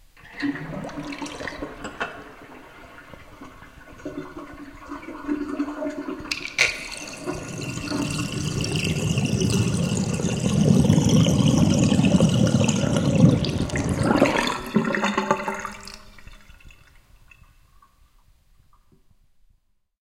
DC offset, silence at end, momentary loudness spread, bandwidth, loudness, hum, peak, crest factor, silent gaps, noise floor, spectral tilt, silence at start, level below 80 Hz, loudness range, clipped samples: under 0.1%; 3.3 s; 23 LU; 16 kHz; -23 LUFS; none; 0 dBFS; 24 dB; none; -64 dBFS; -5.5 dB/octave; 0.25 s; -44 dBFS; 17 LU; under 0.1%